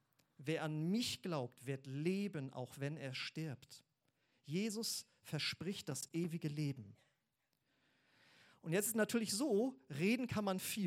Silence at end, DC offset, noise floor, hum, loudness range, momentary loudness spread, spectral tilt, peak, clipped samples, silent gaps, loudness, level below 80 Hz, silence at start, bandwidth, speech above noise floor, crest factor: 0 s; under 0.1%; -86 dBFS; none; 5 LU; 11 LU; -4.5 dB/octave; -24 dBFS; under 0.1%; none; -41 LUFS; -82 dBFS; 0.4 s; 16 kHz; 45 dB; 18 dB